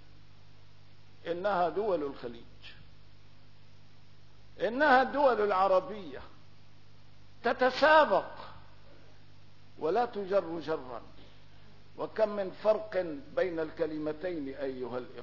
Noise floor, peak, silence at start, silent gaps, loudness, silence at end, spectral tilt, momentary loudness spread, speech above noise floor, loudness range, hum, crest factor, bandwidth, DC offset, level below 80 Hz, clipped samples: -59 dBFS; -10 dBFS; 1.25 s; none; -30 LUFS; 0 s; -6 dB/octave; 21 LU; 29 dB; 7 LU; 50 Hz at -60 dBFS; 22 dB; 6 kHz; 0.4%; -64 dBFS; under 0.1%